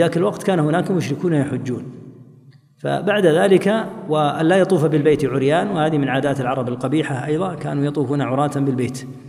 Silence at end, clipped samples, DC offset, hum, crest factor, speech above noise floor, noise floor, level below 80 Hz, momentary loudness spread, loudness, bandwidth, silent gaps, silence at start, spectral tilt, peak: 0 s; under 0.1%; under 0.1%; none; 16 dB; 30 dB; -48 dBFS; -58 dBFS; 8 LU; -19 LUFS; 15 kHz; none; 0 s; -7 dB/octave; -2 dBFS